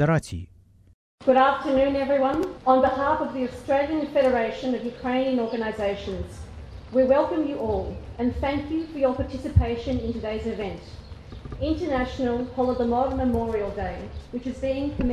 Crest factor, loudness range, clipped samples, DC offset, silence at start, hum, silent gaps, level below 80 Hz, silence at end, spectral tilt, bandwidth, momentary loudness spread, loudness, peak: 18 dB; 5 LU; under 0.1%; under 0.1%; 0 s; none; 0.94-1.18 s; -38 dBFS; 0 s; -7.5 dB/octave; 11.5 kHz; 14 LU; -25 LUFS; -6 dBFS